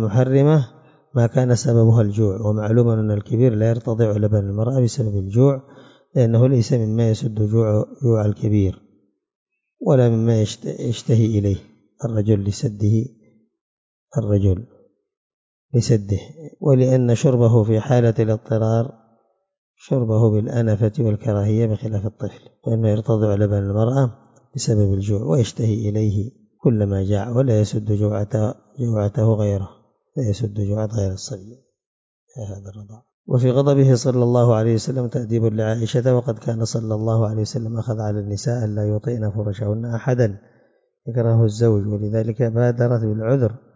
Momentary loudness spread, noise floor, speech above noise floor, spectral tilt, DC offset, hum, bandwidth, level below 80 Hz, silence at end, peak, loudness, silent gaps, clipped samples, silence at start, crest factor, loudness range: 10 LU; -63 dBFS; 45 dB; -8 dB/octave; under 0.1%; none; 7.8 kHz; -42 dBFS; 0.2 s; -4 dBFS; -19 LUFS; 9.35-9.46 s, 13.61-14.07 s, 15.17-15.69 s, 19.58-19.74 s, 31.86-32.27 s, 33.14-33.24 s; under 0.1%; 0 s; 16 dB; 5 LU